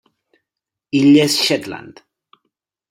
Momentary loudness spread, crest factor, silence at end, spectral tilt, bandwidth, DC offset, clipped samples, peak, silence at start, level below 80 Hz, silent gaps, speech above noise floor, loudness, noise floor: 19 LU; 16 dB; 1 s; -4.5 dB/octave; 16 kHz; under 0.1%; under 0.1%; -2 dBFS; 0.95 s; -62 dBFS; none; 69 dB; -14 LUFS; -83 dBFS